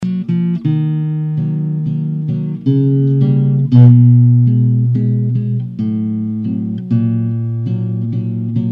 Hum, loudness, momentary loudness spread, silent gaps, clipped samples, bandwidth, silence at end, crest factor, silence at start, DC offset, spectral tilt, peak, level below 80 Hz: none; -14 LUFS; 11 LU; none; 0.1%; 3.5 kHz; 0 s; 12 dB; 0 s; under 0.1%; -12 dB/octave; 0 dBFS; -54 dBFS